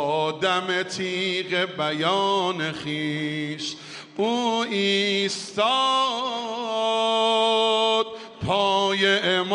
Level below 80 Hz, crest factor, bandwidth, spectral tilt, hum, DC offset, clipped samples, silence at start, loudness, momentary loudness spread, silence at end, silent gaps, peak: -62 dBFS; 16 dB; 11.5 kHz; -3.5 dB/octave; none; under 0.1%; under 0.1%; 0 s; -23 LUFS; 8 LU; 0 s; none; -8 dBFS